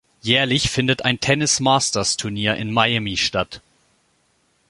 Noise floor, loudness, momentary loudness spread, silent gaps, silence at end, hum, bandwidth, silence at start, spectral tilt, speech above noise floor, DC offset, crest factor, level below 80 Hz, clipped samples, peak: -64 dBFS; -19 LUFS; 5 LU; none; 1.1 s; none; 11.5 kHz; 0.25 s; -3 dB/octave; 44 dB; under 0.1%; 20 dB; -46 dBFS; under 0.1%; 0 dBFS